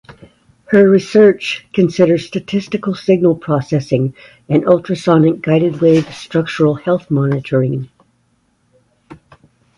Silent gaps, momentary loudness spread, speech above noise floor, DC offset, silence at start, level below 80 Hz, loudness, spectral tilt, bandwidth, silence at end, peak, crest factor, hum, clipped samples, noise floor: none; 10 LU; 46 dB; under 0.1%; 0.7 s; -52 dBFS; -14 LUFS; -7.5 dB/octave; 11.5 kHz; 0.65 s; 0 dBFS; 14 dB; none; under 0.1%; -60 dBFS